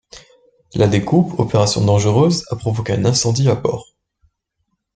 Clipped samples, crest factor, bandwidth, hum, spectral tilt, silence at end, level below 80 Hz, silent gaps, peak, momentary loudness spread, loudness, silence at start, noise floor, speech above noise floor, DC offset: under 0.1%; 16 dB; 9.4 kHz; none; -5.5 dB/octave; 1.15 s; -46 dBFS; none; 0 dBFS; 8 LU; -16 LUFS; 0.15 s; -71 dBFS; 56 dB; under 0.1%